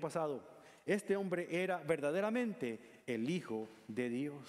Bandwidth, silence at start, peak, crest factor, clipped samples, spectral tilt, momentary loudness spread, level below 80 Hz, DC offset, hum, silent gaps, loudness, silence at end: 15 kHz; 0 s; -20 dBFS; 18 dB; under 0.1%; -6 dB/octave; 9 LU; -80 dBFS; under 0.1%; none; none; -39 LUFS; 0 s